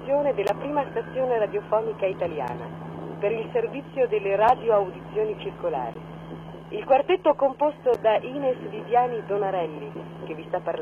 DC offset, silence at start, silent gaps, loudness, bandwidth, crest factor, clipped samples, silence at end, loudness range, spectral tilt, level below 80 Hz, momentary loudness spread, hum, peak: under 0.1%; 0 s; none; -25 LUFS; 12.5 kHz; 18 dB; under 0.1%; 0 s; 3 LU; -7.5 dB/octave; -58 dBFS; 15 LU; none; -8 dBFS